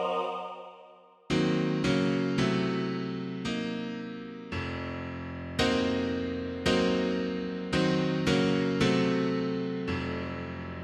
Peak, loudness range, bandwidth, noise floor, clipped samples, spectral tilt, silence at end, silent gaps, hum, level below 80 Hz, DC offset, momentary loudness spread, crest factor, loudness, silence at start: -12 dBFS; 5 LU; 11.5 kHz; -54 dBFS; under 0.1%; -6 dB/octave; 0 s; none; none; -52 dBFS; under 0.1%; 11 LU; 18 dB; -30 LUFS; 0 s